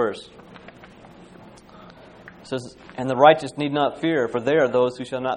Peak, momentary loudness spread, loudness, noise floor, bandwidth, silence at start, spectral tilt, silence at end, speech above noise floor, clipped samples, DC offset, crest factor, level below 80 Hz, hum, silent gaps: 0 dBFS; 16 LU; -21 LUFS; -46 dBFS; 10.5 kHz; 0 s; -6 dB/octave; 0 s; 25 dB; under 0.1%; under 0.1%; 22 dB; -60 dBFS; none; none